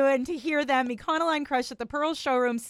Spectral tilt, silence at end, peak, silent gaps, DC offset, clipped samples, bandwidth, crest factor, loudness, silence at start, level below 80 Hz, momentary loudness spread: -3.5 dB/octave; 0 s; -12 dBFS; none; under 0.1%; under 0.1%; 14.5 kHz; 14 dB; -27 LUFS; 0 s; -60 dBFS; 5 LU